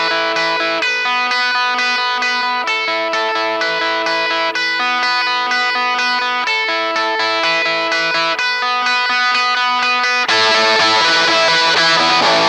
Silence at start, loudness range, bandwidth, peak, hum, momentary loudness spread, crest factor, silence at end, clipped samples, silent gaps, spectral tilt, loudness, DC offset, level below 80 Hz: 0 s; 4 LU; 15.5 kHz; -2 dBFS; none; 5 LU; 14 dB; 0 s; under 0.1%; none; -1 dB/octave; -14 LUFS; under 0.1%; -64 dBFS